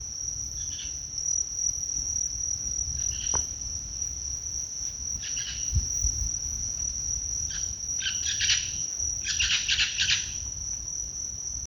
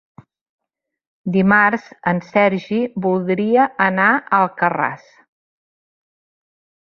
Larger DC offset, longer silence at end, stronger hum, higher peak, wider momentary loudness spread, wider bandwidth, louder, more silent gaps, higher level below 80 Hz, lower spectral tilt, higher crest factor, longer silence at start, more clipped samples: neither; second, 0 s vs 1.9 s; neither; second, -10 dBFS vs -2 dBFS; about the same, 8 LU vs 8 LU; first, over 20 kHz vs 6.6 kHz; second, -27 LUFS vs -17 LUFS; neither; first, -42 dBFS vs -60 dBFS; second, 0.5 dB/octave vs -8 dB/octave; about the same, 20 dB vs 18 dB; second, 0 s vs 1.25 s; neither